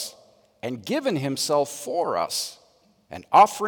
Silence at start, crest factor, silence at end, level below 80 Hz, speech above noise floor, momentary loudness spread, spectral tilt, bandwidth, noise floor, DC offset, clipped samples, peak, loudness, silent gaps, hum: 0 s; 18 dB; 0 s; -70 dBFS; 38 dB; 17 LU; -3.5 dB/octave; 18 kHz; -60 dBFS; under 0.1%; under 0.1%; -6 dBFS; -24 LUFS; none; none